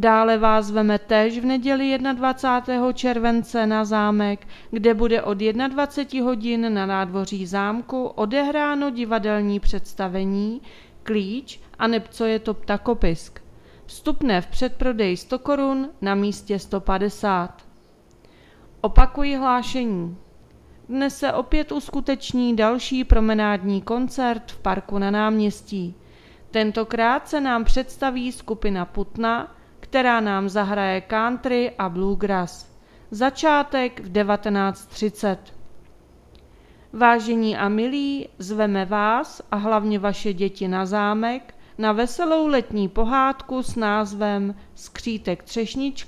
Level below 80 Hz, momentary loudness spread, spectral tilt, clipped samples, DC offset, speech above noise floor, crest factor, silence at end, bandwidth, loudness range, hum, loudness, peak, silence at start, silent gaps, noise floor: -32 dBFS; 9 LU; -6 dB/octave; under 0.1%; under 0.1%; 31 dB; 22 dB; 0.05 s; 13 kHz; 4 LU; none; -22 LUFS; 0 dBFS; 0 s; none; -52 dBFS